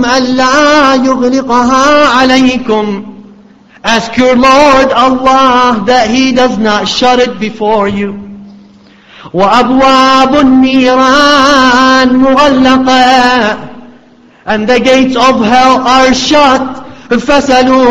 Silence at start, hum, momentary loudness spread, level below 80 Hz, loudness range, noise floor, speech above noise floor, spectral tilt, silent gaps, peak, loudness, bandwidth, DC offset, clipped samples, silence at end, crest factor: 0 s; none; 8 LU; -36 dBFS; 4 LU; -40 dBFS; 34 dB; -3.5 dB/octave; none; 0 dBFS; -6 LUFS; 9.2 kHz; under 0.1%; 1%; 0 s; 8 dB